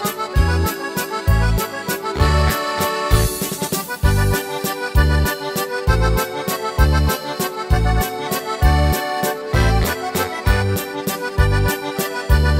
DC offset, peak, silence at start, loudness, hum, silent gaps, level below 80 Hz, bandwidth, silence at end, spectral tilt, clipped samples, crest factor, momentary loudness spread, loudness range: under 0.1%; -2 dBFS; 0 s; -19 LUFS; none; none; -22 dBFS; 16.5 kHz; 0 s; -5 dB/octave; under 0.1%; 16 dB; 6 LU; 1 LU